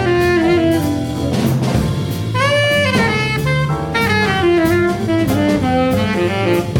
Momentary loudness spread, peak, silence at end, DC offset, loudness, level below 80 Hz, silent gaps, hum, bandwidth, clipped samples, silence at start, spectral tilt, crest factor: 4 LU; -2 dBFS; 0 s; under 0.1%; -15 LUFS; -34 dBFS; none; none; 18 kHz; under 0.1%; 0 s; -6 dB/octave; 12 dB